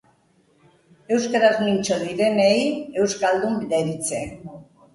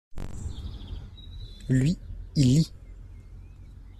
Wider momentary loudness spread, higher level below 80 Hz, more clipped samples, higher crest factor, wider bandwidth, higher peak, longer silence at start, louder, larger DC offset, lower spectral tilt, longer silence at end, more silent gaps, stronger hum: second, 10 LU vs 26 LU; second, -58 dBFS vs -42 dBFS; neither; about the same, 18 dB vs 18 dB; about the same, 11.5 kHz vs 12.5 kHz; first, -4 dBFS vs -10 dBFS; first, 1.1 s vs 0.1 s; first, -21 LUFS vs -26 LUFS; neither; second, -4.5 dB/octave vs -6.5 dB/octave; first, 0.3 s vs 0 s; neither; neither